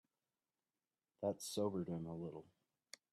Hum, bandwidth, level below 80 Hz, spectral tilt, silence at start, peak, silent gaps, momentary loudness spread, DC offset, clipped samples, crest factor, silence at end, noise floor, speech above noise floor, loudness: none; 14 kHz; -82 dBFS; -5.5 dB/octave; 1.2 s; -26 dBFS; none; 18 LU; under 0.1%; under 0.1%; 20 dB; 0.7 s; under -90 dBFS; over 47 dB; -44 LUFS